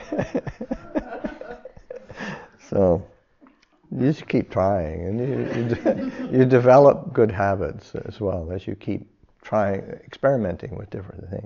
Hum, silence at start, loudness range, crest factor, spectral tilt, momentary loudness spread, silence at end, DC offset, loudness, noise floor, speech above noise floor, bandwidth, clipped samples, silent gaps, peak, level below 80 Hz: none; 0 s; 8 LU; 20 dB; -7.5 dB/octave; 18 LU; 0 s; under 0.1%; -22 LUFS; -56 dBFS; 35 dB; 7 kHz; under 0.1%; none; -2 dBFS; -48 dBFS